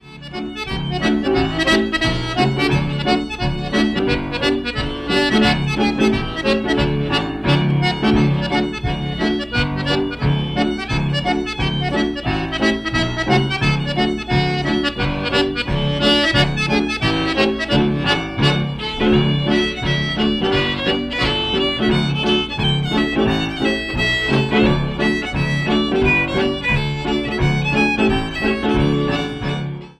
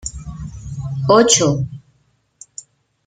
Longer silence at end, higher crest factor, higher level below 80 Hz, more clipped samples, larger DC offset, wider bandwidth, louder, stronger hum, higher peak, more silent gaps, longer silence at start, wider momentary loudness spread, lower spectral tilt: second, 0.1 s vs 1.3 s; second, 14 dB vs 20 dB; first, -32 dBFS vs -40 dBFS; neither; neither; second, 11 kHz vs 16 kHz; second, -18 LUFS vs -15 LUFS; neither; second, -4 dBFS vs 0 dBFS; neither; about the same, 0.05 s vs 0.05 s; second, 5 LU vs 25 LU; first, -6 dB/octave vs -4 dB/octave